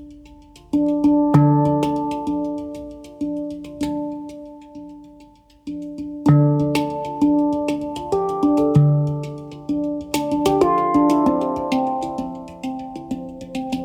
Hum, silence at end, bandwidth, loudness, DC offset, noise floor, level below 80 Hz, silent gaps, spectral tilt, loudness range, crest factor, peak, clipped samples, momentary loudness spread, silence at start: none; 0 s; 15 kHz; -20 LUFS; under 0.1%; -48 dBFS; -48 dBFS; none; -8 dB/octave; 10 LU; 18 dB; -2 dBFS; under 0.1%; 17 LU; 0 s